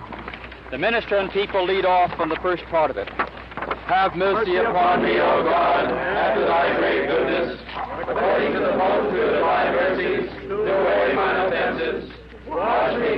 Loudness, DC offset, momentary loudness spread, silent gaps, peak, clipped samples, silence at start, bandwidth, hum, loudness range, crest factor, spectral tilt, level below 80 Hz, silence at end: -21 LUFS; under 0.1%; 10 LU; none; -10 dBFS; under 0.1%; 0 s; 5.8 kHz; none; 3 LU; 10 dB; -7.5 dB/octave; -46 dBFS; 0 s